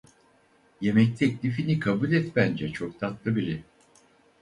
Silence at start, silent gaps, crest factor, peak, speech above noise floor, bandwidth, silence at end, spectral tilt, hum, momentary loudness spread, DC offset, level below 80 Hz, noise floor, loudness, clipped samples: 0.8 s; none; 20 dB; -6 dBFS; 36 dB; 11 kHz; 0.8 s; -8 dB/octave; none; 10 LU; under 0.1%; -58 dBFS; -62 dBFS; -26 LUFS; under 0.1%